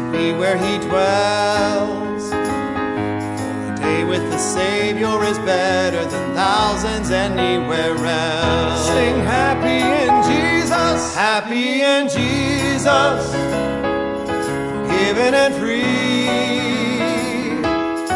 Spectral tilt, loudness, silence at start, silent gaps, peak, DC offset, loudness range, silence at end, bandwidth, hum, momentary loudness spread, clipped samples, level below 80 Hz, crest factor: -4.5 dB/octave; -18 LUFS; 0 s; none; -2 dBFS; under 0.1%; 3 LU; 0 s; 11.5 kHz; none; 7 LU; under 0.1%; -42 dBFS; 14 dB